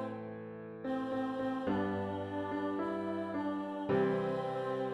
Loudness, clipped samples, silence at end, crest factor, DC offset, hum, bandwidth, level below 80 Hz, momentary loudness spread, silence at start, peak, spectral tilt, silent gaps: -37 LUFS; under 0.1%; 0 s; 14 dB; under 0.1%; none; 10.5 kHz; -68 dBFS; 10 LU; 0 s; -20 dBFS; -8 dB/octave; none